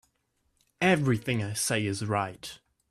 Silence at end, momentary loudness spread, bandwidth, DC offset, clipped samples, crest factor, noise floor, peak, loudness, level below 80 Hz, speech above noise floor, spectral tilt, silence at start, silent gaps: 0.35 s; 12 LU; 15 kHz; under 0.1%; under 0.1%; 18 dB; -74 dBFS; -10 dBFS; -28 LUFS; -62 dBFS; 47 dB; -4.5 dB/octave; 0.8 s; none